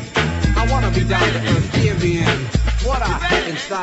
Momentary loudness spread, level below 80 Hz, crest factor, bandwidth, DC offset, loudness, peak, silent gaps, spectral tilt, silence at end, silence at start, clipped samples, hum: 3 LU; -24 dBFS; 16 dB; 8.2 kHz; under 0.1%; -18 LUFS; -2 dBFS; none; -5.5 dB/octave; 0 s; 0 s; under 0.1%; none